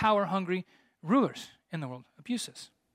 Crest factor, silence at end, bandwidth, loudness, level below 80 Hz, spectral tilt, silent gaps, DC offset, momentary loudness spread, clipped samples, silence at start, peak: 20 dB; 0.3 s; 15.5 kHz; -32 LUFS; -68 dBFS; -5.5 dB/octave; none; under 0.1%; 18 LU; under 0.1%; 0 s; -12 dBFS